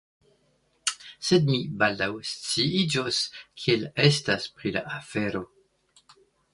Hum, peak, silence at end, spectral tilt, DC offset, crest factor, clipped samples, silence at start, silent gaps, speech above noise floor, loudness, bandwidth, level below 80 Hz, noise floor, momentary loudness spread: none; -4 dBFS; 1.1 s; -4.5 dB/octave; under 0.1%; 22 dB; under 0.1%; 0.85 s; none; 42 dB; -26 LUFS; 11.5 kHz; -60 dBFS; -68 dBFS; 10 LU